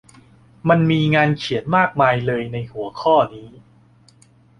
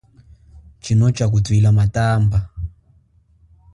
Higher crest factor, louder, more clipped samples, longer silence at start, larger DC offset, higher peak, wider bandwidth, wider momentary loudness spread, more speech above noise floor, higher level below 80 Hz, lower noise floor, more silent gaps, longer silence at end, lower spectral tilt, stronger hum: about the same, 18 dB vs 14 dB; about the same, -18 LUFS vs -17 LUFS; neither; about the same, 0.65 s vs 0.55 s; neither; first, -2 dBFS vs -6 dBFS; about the same, 10 kHz vs 11 kHz; second, 10 LU vs 17 LU; second, 34 dB vs 40 dB; second, -52 dBFS vs -36 dBFS; about the same, -52 dBFS vs -55 dBFS; neither; about the same, 1.1 s vs 1.05 s; about the same, -7.5 dB/octave vs -7 dB/octave; neither